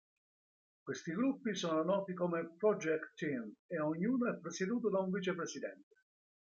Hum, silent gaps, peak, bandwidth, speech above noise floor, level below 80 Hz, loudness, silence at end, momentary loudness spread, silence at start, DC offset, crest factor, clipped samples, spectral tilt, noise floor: none; 3.59-3.69 s; -20 dBFS; 7.8 kHz; over 53 dB; -84 dBFS; -37 LUFS; 0.75 s; 9 LU; 0.85 s; under 0.1%; 18 dB; under 0.1%; -5.5 dB/octave; under -90 dBFS